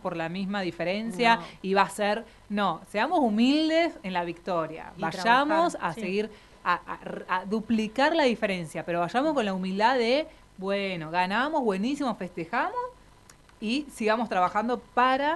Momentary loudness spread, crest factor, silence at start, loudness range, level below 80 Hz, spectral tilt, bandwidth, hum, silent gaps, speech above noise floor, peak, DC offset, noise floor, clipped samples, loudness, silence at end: 10 LU; 22 dB; 0.05 s; 4 LU; -60 dBFS; -5 dB/octave; 12 kHz; none; none; 28 dB; -6 dBFS; under 0.1%; -54 dBFS; under 0.1%; -27 LUFS; 0 s